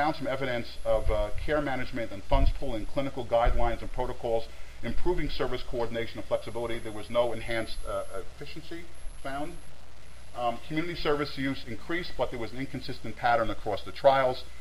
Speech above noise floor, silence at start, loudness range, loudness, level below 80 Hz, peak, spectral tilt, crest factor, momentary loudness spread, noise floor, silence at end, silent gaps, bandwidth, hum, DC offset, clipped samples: 20 dB; 0 s; 5 LU; -31 LUFS; -38 dBFS; -8 dBFS; -6 dB/octave; 20 dB; 14 LU; -48 dBFS; 0 s; none; 14.5 kHz; none; 2%; under 0.1%